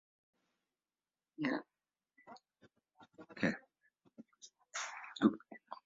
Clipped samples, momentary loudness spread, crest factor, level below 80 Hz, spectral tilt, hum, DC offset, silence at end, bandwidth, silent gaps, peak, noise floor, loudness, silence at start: under 0.1%; 25 LU; 26 dB; -80 dBFS; -4.5 dB/octave; none; under 0.1%; 0.1 s; 7.4 kHz; none; -16 dBFS; under -90 dBFS; -39 LUFS; 1.4 s